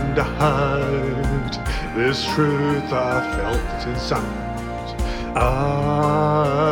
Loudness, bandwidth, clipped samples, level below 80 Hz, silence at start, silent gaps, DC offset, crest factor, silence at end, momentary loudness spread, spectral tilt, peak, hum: -21 LUFS; 18 kHz; under 0.1%; -30 dBFS; 0 s; none; under 0.1%; 16 dB; 0 s; 8 LU; -6.5 dB/octave; -4 dBFS; none